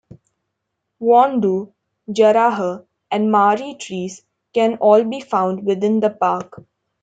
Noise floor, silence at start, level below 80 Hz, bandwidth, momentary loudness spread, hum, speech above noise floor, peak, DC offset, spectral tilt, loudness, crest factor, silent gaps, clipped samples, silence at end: -76 dBFS; 1 s; -68 dBFS; 9 kHz; 14 LU; none; 60 dB; -2 dBFS; under 0.1%; -6 dB/octave; -17 LUFS; 16 dB; none; under 0.1%; 0.4 s